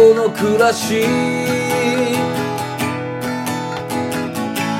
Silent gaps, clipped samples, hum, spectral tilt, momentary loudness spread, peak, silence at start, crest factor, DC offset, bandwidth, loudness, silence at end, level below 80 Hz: none; under 0.1%; none; -5 dB/octave; 8 LU; 0 dBFS; 0 s; 16 dB; under 0.1%; 16.5 kHz; -18 LUFS; 0 s; -58 dBFS